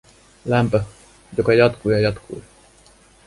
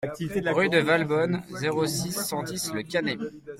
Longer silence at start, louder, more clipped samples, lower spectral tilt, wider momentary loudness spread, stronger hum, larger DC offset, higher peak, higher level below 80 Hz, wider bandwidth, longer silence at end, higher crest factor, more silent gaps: first, 0.45 s vs 0 s; first, -19 LUFS vs -26 LUFS; neither; first, -7 dB/octave vs -4.5 dB/octave; first, 19 LU vs 8 LU; neither; neither; first, -2 dBFS vs -8 dBFS; first, -46 dBFS vs -60 dBFS; second, 11.5 kHz vs 16.5 kHz; first, 0.85 s vs 0 s; about the same, 18 dB vs 18 dB; neither